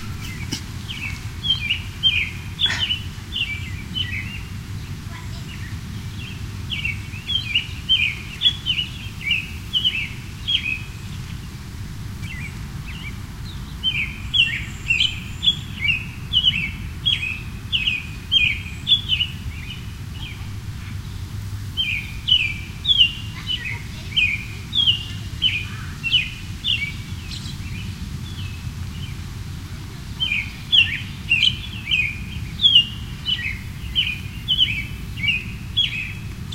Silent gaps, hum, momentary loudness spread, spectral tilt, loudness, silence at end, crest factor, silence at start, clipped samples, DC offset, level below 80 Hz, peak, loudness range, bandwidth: none; none; 16 LU; -3 dB/octave; -21 LUFS; 0 s; 22 dB; 0 s; under 0.1%; under 0.1%; -38 dBFS; -2 dBFS; 9 LU; 16 kHz